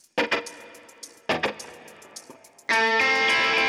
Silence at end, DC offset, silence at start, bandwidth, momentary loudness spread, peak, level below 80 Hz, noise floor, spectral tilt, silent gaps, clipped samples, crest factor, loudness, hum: 0 s; under 0.1%; 0.15 s; 15.5 kHz; 24 LU; -10 dBFS; -64 dBFS; -49 dBFS; -1.5 dB/octave; none; under 0.1%; 16 dB; -22 LUFS; none